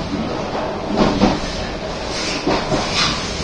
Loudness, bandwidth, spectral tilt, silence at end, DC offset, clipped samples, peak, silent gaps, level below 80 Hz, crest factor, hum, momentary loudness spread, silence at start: -19 LUFS; 10.5 kHz; -4.5 dB/octave; 0 s; under 0.1%; under 0.1%; 0 dBFS; none; -32 dBFS; 18 dB; none; 8 LU; 0 s